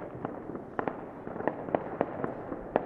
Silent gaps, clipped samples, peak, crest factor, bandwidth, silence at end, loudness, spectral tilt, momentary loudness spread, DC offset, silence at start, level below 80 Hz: none; under 0.1%; -6 dBFS; 30 dB; 5.8 kHz; 0 s; -36 LUFS; -9.5 dB/octave; 8 LU; under 0.1%; 0 s; -60 dBFS